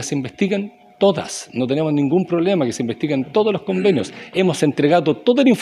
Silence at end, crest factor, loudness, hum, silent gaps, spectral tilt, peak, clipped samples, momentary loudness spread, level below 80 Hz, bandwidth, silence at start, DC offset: 0 s; 16 dB; -19 LUFS; none; none; -6 dB/octave; -2 dBFS; under 0.1%; 8 LU; -62 dBFS; 13 kHz; 0 s; under 0.1%